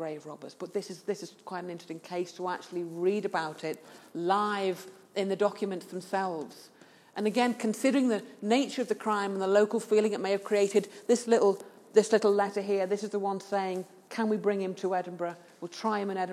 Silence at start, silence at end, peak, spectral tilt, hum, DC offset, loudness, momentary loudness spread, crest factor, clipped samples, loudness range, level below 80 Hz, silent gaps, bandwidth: 0 s; 0 s; -10 dBFS; -5 dB/octave; none; under 0.1%; -30 LUFS; 14 LU; 20 dB; under 0.1%; 7 LU; under -90 dBFS; none; 14.5 kHz